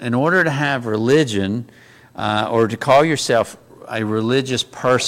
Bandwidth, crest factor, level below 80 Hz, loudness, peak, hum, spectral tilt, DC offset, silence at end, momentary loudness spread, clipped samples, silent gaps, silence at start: 16.5 kHz; 14 dB; -56 dBFS; -18 LUFS; -4 dBFS; none; -5 dB/octave; under 0.1%; 0 s; 11 LU; under 0.1%; none; 0 s